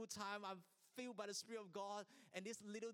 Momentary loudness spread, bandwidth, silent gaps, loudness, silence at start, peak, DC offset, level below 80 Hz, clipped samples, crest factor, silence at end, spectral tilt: 6 LU; 18 kHz; none; -52 LUFS; 0 s; -32 dBFS; under 0.1%; under -90 dBFS; under 0.1%; 20 dB; 0 s; -3 dB/octave